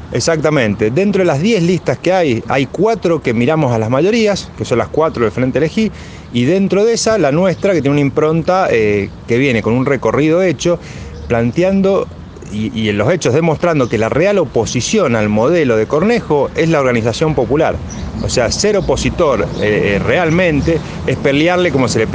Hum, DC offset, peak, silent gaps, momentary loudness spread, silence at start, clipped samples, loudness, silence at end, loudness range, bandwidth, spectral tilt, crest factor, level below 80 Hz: none; under 0.1%; 0 dBFS; none; 5 LU; 0 s; under 0.1%; -14 LUFS; 0 s; 2 LU; 10 kHz; -5.5 dB/octave; 14 dB; -36 dBFS